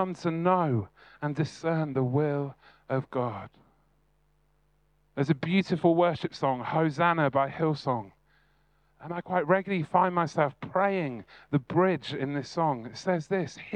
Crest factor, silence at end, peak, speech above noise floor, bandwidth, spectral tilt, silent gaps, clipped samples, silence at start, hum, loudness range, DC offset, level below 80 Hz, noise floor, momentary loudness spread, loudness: 22 dB; 0 s; -8 dBFS; 41 dB; 9.4 kHz; -7.5 dB/octave; none; under 0.1%; 0 s; none; 6 LU; under 0.1%; -68 dBFS; -69 dBFS; 10 LU; -28 LUFS